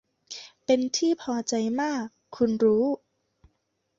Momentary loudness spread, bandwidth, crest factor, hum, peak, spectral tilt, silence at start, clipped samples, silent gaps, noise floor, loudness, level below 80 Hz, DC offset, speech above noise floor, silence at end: 17 LU; 7.8 kHz; 16 dB; none; -10 dBFS; -4 dB/octave; 0.3 s; under 0.1%; none; -75 dBFS; -26 LUFS; -66 dBFS; under 0.1%; 50 dB; 1 s